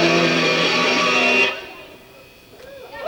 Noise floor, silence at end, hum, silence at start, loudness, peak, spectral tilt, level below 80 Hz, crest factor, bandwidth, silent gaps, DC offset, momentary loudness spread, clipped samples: -45 dBFS; 0 s; none; 0 s; -16 LUFS; -6 dBFS; -3.5 dB/octave; -58 dBFS; 14 dB; over 20 kHz; none; under 0.1%; 18 LU; under 0.1%